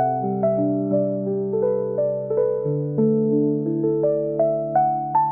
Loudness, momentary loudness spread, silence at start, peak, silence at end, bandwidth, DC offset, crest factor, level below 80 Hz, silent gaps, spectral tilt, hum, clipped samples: -22 LUFS; 4 LU; 0 s; -8 dBFS; 0 s; 2.4 kHz; 0.1%; 12 dB; -64 dBFS; none; -15 dB/octave; none; under 0.1%